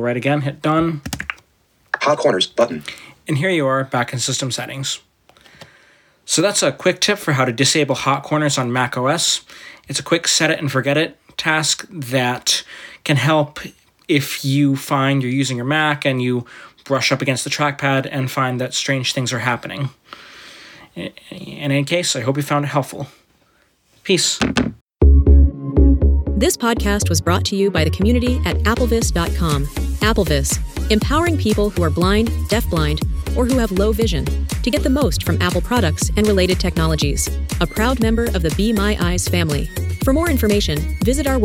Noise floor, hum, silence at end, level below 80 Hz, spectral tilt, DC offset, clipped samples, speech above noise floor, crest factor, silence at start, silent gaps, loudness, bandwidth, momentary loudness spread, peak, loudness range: -59 dBFS; none; 0 s; -24 dBFS; -4.5 dB/octave; under 0.1%; under 0.1%; 41 dB; 18 dB; 0 s; 24.81-24.87 s; -18 LUFS; 18.5 kHz; 10 LU; 0 dBFS; 5 LU